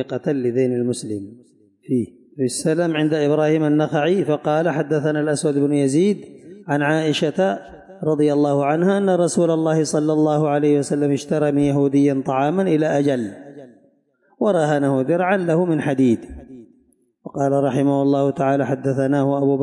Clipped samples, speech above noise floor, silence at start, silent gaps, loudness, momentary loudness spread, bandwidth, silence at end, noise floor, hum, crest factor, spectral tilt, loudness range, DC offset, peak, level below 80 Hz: under 0.1%; 42 dB; 0 s; none; -19 LUFS; 7 LU; 11.5 kHz; 0 s; -61 dBFS; none; 12 dB; -6.5 dB/octave; 2 LU; under 0.1%; -8 dBFS; -58 dBFS